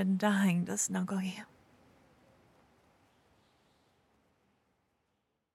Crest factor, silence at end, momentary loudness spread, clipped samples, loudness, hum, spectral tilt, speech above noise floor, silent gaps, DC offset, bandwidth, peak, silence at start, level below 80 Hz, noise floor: 18 dB; 4.1 s; 16 LU; under 0.1%; -32 LUFS; none; -5 dB/octave; 50 dB; none; under 0.1%; 13 kHz; -18 dBFS; 0 s; -80 dBFS; -81 dBFS